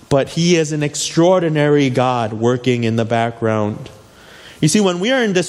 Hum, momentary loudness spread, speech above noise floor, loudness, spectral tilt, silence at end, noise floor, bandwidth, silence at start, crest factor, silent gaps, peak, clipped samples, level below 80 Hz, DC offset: none; 5 LU; 26 dB; -16 LUFS; -5 dB/octave; 0 s; -41 dBFS; 13 kHz; 0.1 s; 14 dB; none; -2 dBFS; under 0.1%; -52 dBFS; under 0.1%